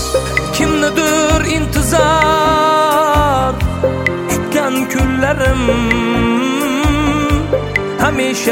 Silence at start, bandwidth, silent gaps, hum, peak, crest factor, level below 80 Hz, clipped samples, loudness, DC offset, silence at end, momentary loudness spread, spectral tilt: 0 s; 16.5 kHz; none; none; 0 dBFS; 12 dB; -24 dBFS; under 0.1%; -14 LUFS; under 0.1%; 0 s; 5 LU; -4.5 dB/octave